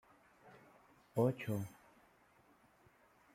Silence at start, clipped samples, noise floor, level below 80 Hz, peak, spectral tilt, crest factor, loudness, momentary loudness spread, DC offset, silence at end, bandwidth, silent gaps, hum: 0.45 s; under 0.1%; -69 dBFS; -80 dBFS; -20 dBFS; -8 dB/octave; 24 dB; -39 LUFS; 27 LU; under 0.1%; 1.65 s; 16.5 kHz; none; none